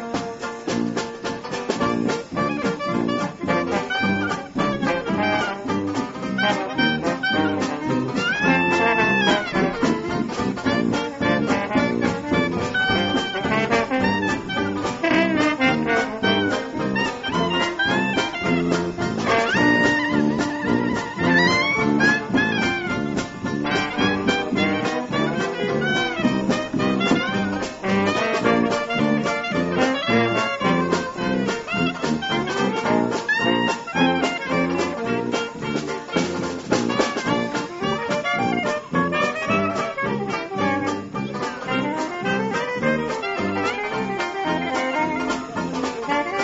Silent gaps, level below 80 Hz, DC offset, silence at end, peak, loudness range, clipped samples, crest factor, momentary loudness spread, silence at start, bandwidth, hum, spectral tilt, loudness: none; -50 dBFS; under 0.1%; 0 s; -4 dBFS; 4 LU; under 0.1%; 18 dB; 7 LU; 0 s; 8 kHz; none; -3.5 dB/octave; -22 LUFS